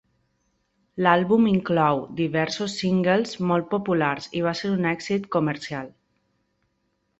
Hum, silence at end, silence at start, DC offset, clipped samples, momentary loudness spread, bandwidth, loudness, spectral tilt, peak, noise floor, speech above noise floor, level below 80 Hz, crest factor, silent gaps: none; 1.3 s; 0.95 s; under 0.1%; under 0.1%; 7 LU; 8.2 kHz; -23 LUFS; -6 dB/octave; -2 dBFS; -73 dBFS; 50 dB; -60 dBFS; 22 dB; none